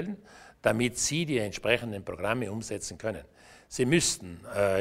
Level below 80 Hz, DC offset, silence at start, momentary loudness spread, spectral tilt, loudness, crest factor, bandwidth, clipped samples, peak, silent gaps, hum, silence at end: -56 dBFS; under 0.1%; 0 s; 12 LU; -4 dB/octave; -29 LUFS; 22 dB; 16 kHz; under 0.1%; -8 dBFS; none; none; 0 s